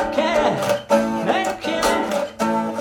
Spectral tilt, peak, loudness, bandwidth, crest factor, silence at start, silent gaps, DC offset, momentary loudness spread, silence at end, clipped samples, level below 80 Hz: -4 dB/octave; -4 dBFS; -20 LUFS; 18 kHz; 16 dB; 0 s; none; under 0.1%; 4 LU; 0 s; under 0.1%; -48 dBFS